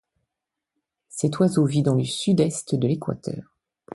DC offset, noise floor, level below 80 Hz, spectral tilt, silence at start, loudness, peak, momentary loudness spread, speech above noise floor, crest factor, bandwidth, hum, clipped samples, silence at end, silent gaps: under 0.1%; -85 dBFS; -60 dBFS; -6.5 dB/octave; 1.15 s; -23 LUFS; -8 dBFS; 13 LU; 63 dB; 18 dB; 11.5 kHz; none; under 0.1%; 0.55 s; none